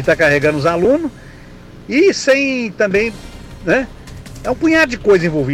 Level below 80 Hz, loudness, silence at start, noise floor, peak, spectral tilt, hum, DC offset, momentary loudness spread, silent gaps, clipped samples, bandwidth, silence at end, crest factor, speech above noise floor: -38 dBFS; -14 LUFS; 0 s; -36 dBFS; -4 dBFS; -5.5 dB/octave; none; under 0.1%; 15 LU; none; under 0.1%; 15.5 kHz; 0 s; 12 dB; 22 dB